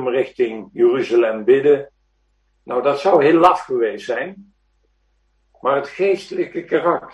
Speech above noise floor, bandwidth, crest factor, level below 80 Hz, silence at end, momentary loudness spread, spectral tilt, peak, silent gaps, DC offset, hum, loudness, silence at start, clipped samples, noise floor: 47 dB; 8.8 kHz; 16 dB; -62 dBFS; 0.05 s; 11 LU; -6.5 dB/octave; -2 dBFS; none; under 0.1%; none; -18 LUFS; 0 s; under 0.1%; -64 dBFS